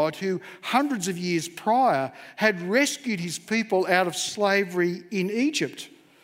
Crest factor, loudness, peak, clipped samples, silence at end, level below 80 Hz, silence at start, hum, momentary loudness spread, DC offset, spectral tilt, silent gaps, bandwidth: 20 dB; -25 LUFS; -4 dBFS; under 0.1%; 0.35 s; -76 dBFS; 0 s; none; 8 LU; under 0.1%; -4 dB/octave; none; 16 kHz